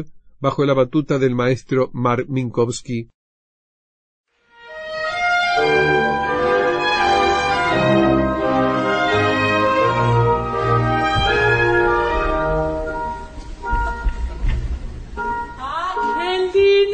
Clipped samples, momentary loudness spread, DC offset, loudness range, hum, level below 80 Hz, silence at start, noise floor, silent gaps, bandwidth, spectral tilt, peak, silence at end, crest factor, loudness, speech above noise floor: under 0.1%; 11 LU; under 0.1%; 8 LU; none; -32 dBFS; 0 s; -43 dBFS; 3.14-4.24 s; 9.2 kHz; -6 dB/octave; -4 dBFS; 0 s; 14 dB; -18 LUFS; 24 dB